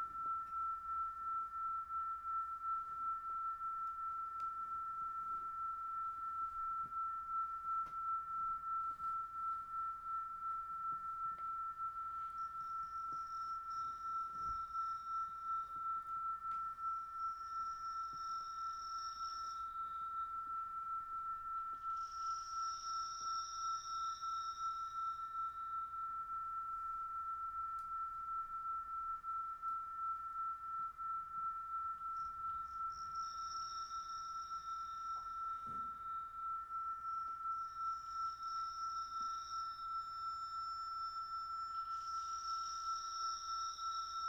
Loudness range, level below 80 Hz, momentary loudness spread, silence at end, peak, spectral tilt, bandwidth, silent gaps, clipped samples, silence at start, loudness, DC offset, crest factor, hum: 2 LU; -70 dBFS; 3 LU; 0 s; -32 dBFS; -1 dB/octave; 13.5 kHz; none; under 0.1%; 0 s; -43 LUFS; under 0.1%; 12 dB; none